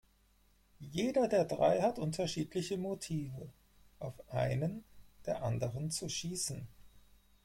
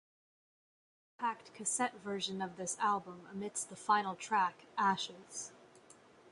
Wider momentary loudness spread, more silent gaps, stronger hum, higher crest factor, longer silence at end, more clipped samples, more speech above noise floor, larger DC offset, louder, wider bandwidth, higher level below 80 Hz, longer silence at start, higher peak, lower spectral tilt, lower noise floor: first, 17 LU vs 12 LU; neither; neither; about the same, 20 dB vs 20 dB; first, 0.45 s vs 0 s; neither; first, 34 dB vs 24 dB; neither; about the same, -36 LUFS vs -37 LUFS; first, 16.5 kHz vs 11.5 kHz; first, -62 dBFS vs -82 dBFS; second, 0.8 s vs 1.2 s; about the same, -18 dBFS vs -18 dBFS; first, -5 dB/octave vs -2.5 dB/octave; first, -69 dBFS vs -61 dBFS